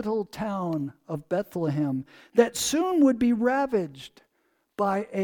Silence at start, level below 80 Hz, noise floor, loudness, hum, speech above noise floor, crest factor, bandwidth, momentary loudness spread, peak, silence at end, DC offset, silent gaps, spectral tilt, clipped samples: 0 s; -60 dBFS; -72 dBFS; -26 LUFS; none; 46 dB; 20 dB; 19 kHz; 14 LU; -6 dBFS; 0 s; under 0.1%; none; -5 dB/octave; under 0.1%